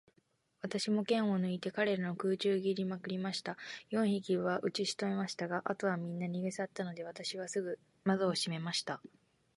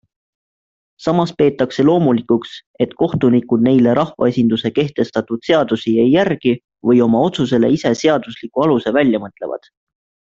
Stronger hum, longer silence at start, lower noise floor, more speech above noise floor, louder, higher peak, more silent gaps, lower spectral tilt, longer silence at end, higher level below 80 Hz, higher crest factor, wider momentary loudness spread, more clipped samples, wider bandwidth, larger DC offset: neither; second, 0.65 s vs 1 s; second, -75 dBFS vs under -90 dBFS; second, 40 dB vs over 75 dB; second, -36 LUFS vs -16 LUFS; second, -18 dBFS vs 0 dBFS; second, none vs 2.67-2.74 s; second, -5 dB/octave vs -7 dB/octave; second, 0.5 s vs 0.75 s; second, -80 dBFS vs -54 dBFS; about the same, 18 dB vs 16 dB; about the same, 9 LU vs 9 LU; neither; first, 11.5 kHz vs 7.6 kHz; neither